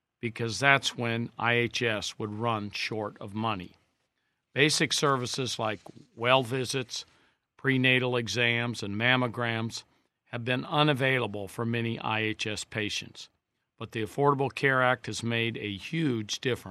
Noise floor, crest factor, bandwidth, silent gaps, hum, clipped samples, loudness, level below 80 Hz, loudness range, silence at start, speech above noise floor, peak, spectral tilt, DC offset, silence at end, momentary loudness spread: -79 dBFS; 24 dB; 14 kHz; none; none; under 0.1%; -28 LUFS; -70 dBFS; 3 LU; 0.25 s; 50 dB; -4 dBFS; -4 dB/octave; under 0.1%; 0 s; 13 LU